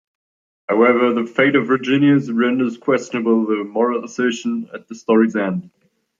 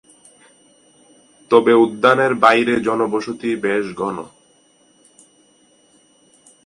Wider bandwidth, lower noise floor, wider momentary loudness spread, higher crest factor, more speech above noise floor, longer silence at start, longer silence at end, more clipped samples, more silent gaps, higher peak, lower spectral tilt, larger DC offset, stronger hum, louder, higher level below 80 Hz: second, 7.6 kHz vs 11 kHz; first, under -90 dBFS vs -55 dBFS; about the same, 10 LU vs 12 LU; about the same, 16 dB vs 20 dB; first, over 73 dB vs 39 dB; second, 0.7 s vs 1.5 s; second, 0.55 s vs 2.4 s; neither; neither; about the same, -2 dBFS vs 0 dBFS; about the same, -6 dB/octave vs -5.5 dB/octave; neither; neither; about the same, -17 LUFS vs -16 LUFS; second, -68 dBFS vs -62 dBFS